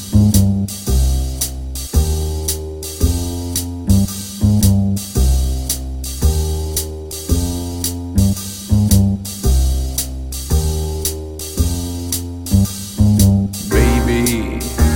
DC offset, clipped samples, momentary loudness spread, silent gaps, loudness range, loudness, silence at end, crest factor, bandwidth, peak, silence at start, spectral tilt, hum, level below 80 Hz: under 0.1%; under 0.1%; 9 LU; none; 3 LU; -17 LUFS; 0 s; 16 dB; 17 kHz; 0 dBFS; 0 s; -5.5 dB/octave; none; -20 dBFS